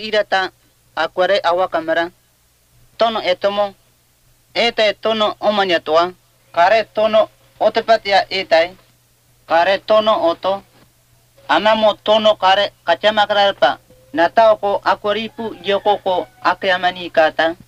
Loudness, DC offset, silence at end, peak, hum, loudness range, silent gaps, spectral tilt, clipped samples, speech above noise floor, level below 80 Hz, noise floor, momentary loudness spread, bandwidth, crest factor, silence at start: -16 LUFS; under 0.1%; 0.15 s; 0 dBFS; none; 4 LU; none; -4 dB/octave; under 0.1%; 41 dB; -56 dBFS; -57 dBFS; 9 LU; 10.5 kHz; 16 dB; 0 s